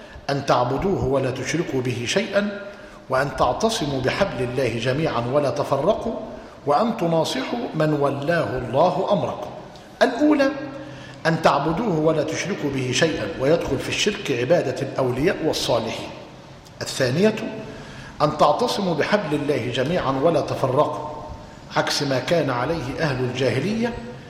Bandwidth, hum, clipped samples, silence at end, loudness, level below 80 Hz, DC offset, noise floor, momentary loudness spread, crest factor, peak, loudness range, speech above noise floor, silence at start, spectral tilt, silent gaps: 16 kHz; none; under 0.1%; 0 s; -22 LUFS; -48 dBFS; under 0.1%; -42 dBFS; 13 LU; 16 dB; -6 dBFS; 2 LU; 21 dB; 0 s; -5 dB/octave; none